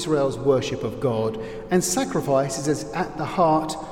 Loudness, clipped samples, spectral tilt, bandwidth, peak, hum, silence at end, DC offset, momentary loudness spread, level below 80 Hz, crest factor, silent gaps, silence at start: -23 LUFS; under 0.1%; -5 dB/octave; 16.5 kHz; -6 dBFS; none; 0 s; under 0.1%; 7 LU; -48 dBFS; 16 dB; none; 0 s